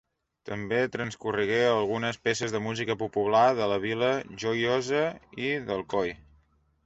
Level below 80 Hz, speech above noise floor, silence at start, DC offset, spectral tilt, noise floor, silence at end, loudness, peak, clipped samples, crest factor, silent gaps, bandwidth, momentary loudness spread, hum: -62 dBFS; 38 dB; 0.45 s; under 0.1%; -5 dB/octave; -66 dBFS; 0.7 s; -28 LUFS; -10 dBFS; under 0.1%; 18 dB; none; 8.2 kHz; 9 LU; none